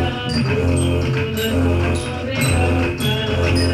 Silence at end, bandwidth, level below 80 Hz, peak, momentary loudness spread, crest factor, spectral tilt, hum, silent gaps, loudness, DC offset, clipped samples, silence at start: 0 s; 14.5 kHz; -36 dBFS; -6 dBFS; 3 LU; 12 dB; -5.5 dB/octave; none; none; -19 LUFS; under 0.1%; under 0.1%; 0 s